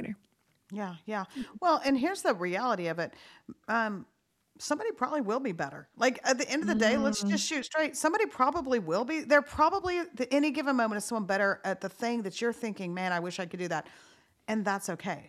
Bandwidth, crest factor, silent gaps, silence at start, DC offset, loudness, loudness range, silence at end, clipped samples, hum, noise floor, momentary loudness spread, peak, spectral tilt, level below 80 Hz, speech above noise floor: 14.5 kHz; 20 dB; none; 0 s; under 0.1%; -30 LUFS; 5 LU; 0 s; under 0.1%; none; -70 dBFS; 11 LU; -10 dBFS; -4 dB/octave; -64 dBFS; 40 dB